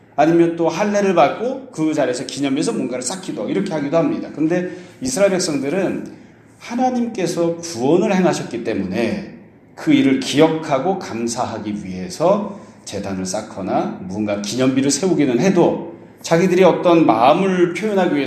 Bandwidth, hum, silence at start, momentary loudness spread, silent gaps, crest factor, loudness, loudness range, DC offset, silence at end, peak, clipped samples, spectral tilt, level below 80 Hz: 13.5 kHz; none; 0.15 s; 12 LU; none; 18 dB; -18 LUFS; 6 LU; under 0.1%; 0 s; 0 dBFS; under 0.1%; -5.5 dB/octave; -58 dBFS